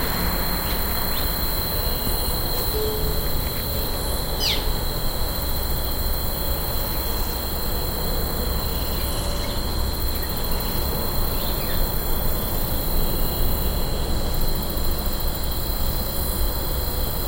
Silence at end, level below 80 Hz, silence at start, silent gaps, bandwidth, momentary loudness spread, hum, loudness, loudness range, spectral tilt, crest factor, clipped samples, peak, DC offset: 0 s; -26 dBFS; 0 s; none; 17 kHz; 3 LU; none; -24 LUFS; 2 LU; -4 dB/octave; 14 dB; under 0.1%; -8 dBFS; under 0.1%